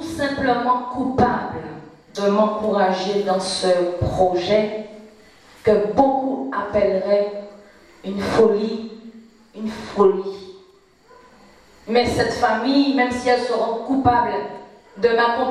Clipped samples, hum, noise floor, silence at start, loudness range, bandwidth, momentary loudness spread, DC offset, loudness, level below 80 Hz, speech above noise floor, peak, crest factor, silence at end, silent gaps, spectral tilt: under 0.1%; none; -52 dBFS; 0 s; 3 LU; 13 kHz; 15 LU; under 0.1%; -20 LUFS; -46 dBFS; 33 dB; -2 dBFS; 18 dB; 0 s; none; -5.5 dB/octave